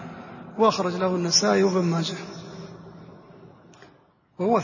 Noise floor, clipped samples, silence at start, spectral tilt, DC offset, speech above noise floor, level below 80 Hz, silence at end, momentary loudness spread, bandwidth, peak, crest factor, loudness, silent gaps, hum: -58 dBFS; under 0.1%; 0 s; -4 dB/octave; under 0.1%; 36 dB; -66 dBFS; 0 s; 21 LU; 7.4 kHz; -6 dBFS; 20 dB; -22 LUFS; none; none